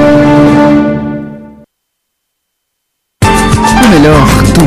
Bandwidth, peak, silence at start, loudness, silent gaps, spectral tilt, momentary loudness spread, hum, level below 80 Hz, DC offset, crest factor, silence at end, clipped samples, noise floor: 15.5 kHz; 0 dBFS; 0 s; -6 LUFS; none; -6 dB/octave; 12 LU; none; -20 dBFS; under 0.1%; 8 dB; 0 s; 0.2%; -67 dBFS